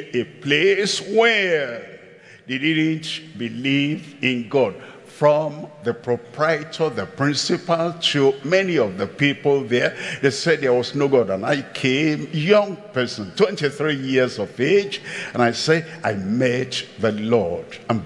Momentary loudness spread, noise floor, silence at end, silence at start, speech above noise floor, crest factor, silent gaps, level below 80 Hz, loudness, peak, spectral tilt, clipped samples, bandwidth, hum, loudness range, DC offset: 9 LU; -46 dBFS; 0 s; 0 s; 25 dB; 20 dB; none; -68 dBFS; -20 LUFS; -2 dBFS; -5 dB/octave; under 0.1%; 11.5 kHz; none; 3 LU; under 0.1%